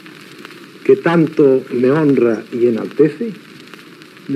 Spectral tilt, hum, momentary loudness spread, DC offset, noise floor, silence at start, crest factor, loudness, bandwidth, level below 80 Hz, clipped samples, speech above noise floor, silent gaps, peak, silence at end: -8 dB/octave; none; 23 LU; under 0.1%; -39 dBFS; 0.05 s; 16 dB; -15 LUFS; 12.5 kHz; -72 dBFS; under 0.1%; 25 dB; none; 0 dBFS; 0 s